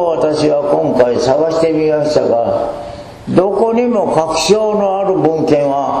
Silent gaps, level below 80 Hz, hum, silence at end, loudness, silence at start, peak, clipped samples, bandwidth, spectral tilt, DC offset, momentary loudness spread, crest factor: none; -44 dBFS; none; 0 s; -13 LUFS; 0 s; 0 dBFS; 0.1%; 13 kHz; -5.5 dB/octave; under 0.1%; 4 LU; 12 dB